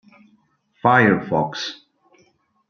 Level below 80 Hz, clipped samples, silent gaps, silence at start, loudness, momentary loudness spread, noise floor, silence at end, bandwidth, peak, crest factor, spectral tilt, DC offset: -60 dBFS; under 0.1%; none; 0.85 s; -19 LUFS; 14 LU; -61 dBFS; 0.95 s; 7.2 kHz; -2 dBFS; 22 dB; -6 dB/octave; under 0.1%